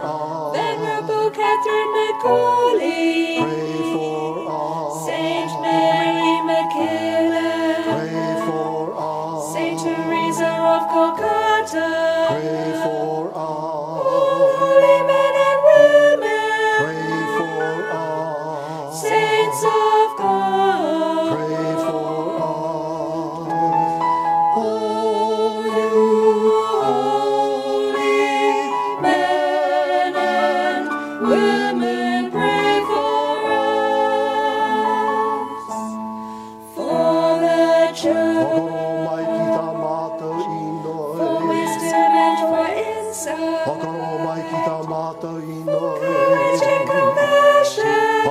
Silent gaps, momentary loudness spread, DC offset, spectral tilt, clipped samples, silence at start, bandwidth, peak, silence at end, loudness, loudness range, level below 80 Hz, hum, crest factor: none; 10 LU; under 0.1%; -4.5 dB/octave; under 0.1%; 0 s; 15.5 kHz; -2 dBFS; 0 s; -19 LUFS; 5 LU; -66 dBFS; none; 18 dB